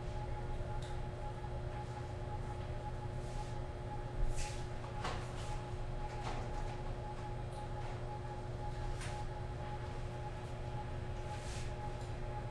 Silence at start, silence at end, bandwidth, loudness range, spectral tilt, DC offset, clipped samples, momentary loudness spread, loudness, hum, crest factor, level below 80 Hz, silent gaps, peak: 0 s; 0 s; 12 kHz; 1 LU; -6 dB/octave; under 0.1%; under 0.1%; 2 LU; -44 LUFS; none; 16 dB; -46 dBFS; none; -26 dBFS